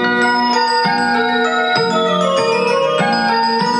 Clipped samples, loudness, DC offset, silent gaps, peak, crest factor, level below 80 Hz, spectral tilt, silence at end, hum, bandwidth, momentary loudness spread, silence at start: under 0.1%; -14 LUFS; under 0.1%; none; -2 dBFS; 14 dB; -60 dBFS; -4 dB/octave; 0 s; none; 11 kHz; 1 LU; 0 s